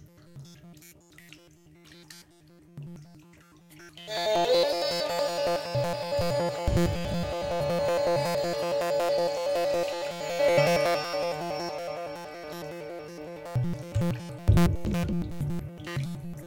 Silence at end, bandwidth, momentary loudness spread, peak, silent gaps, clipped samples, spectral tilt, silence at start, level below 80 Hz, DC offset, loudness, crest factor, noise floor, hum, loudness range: 0 s; 17 kHz; 20 LU; -10 dBFS; none; under 0.1%; -5.5 dB/octave; 0 s; -44 dBFS; under 0.1%; -28 LUFS; 20 dB; -56 dBFS; none; 7 LU